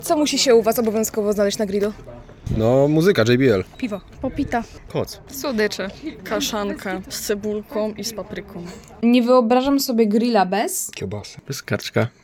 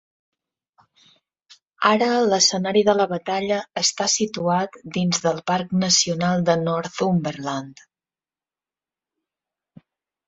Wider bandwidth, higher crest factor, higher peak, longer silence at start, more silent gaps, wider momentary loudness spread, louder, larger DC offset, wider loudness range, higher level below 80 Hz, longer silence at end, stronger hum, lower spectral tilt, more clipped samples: first, 18 kHz vs 8.2 kHz; second, 16 dB vs 22 dB; about the same, -4 dBFS vs -2 dBFS; second, 0 s vs 1.8 s; neither; first, 15 LU vs 8 LU; about the same, -20 LUFS vs -20 LUFS; neither; about the same, 6 LU vs 7 LU; first, -44 dBFS vs -62 dBFS; second, 0.15 s vs 2.55 s; neither; first, -5 dB/octave vs -3.5 dB/octave; neither